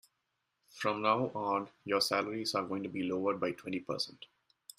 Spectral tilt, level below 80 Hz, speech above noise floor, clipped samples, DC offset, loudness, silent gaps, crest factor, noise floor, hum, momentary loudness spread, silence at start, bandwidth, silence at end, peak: -4 dB/octave; -76 dBFS; 49 dB; under 0.1%; under 0.1%; -34 LUFS; none; 22 dB; -83 dBFS; none; 8 LU; 0.75 s; 15.5 kHz; 0.55 s; -14 dBFS